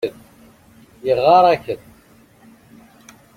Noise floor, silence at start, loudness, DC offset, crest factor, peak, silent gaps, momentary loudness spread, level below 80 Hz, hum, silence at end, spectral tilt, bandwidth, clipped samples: -50 dBFS; 0.05 s; -16 LUFS; under 0.1%; 18 dB; -2 dBFS; none; 18 LU; -58 dBFS; none; 1.6 s; -6 dB/octave; 15.5 kHz; under 0.1%